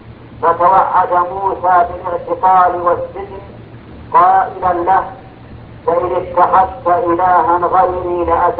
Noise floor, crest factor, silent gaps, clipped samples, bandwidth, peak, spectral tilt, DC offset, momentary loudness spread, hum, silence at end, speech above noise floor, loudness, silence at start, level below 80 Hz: -34 dBFS; 14 dB; none; under 0.1%; 4.7 kHz; 0 dBFS; -10 dB/octave; under 0.1%; 10 LU; none; 0 s; 22 dB; -13 LUFS; 0.05 s; -40 dBFS